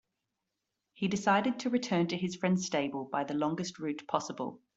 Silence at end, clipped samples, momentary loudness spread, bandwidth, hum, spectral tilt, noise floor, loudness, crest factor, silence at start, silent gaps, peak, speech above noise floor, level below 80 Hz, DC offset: 0.2 s; under 0.1%; 8 LU; 8 kHz; none; -5 dB/octave; -86 dBFS; -32 LUFS; 20 dB; 1 s; none; -14 dBFS; 54 dB; -74 dBFS; under 0.1%